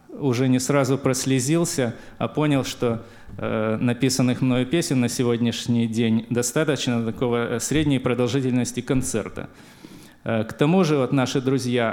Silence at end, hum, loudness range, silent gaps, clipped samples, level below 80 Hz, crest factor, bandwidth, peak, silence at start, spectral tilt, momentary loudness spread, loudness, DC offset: 0 s; none; 2 LU; none; under 0.1%; -48 dBFS; 16 dB; 17 kHz; -6 dBFS; 0.1 s; -5.5 dB/octave; 7 LU; -22 LUFS; under 0.1%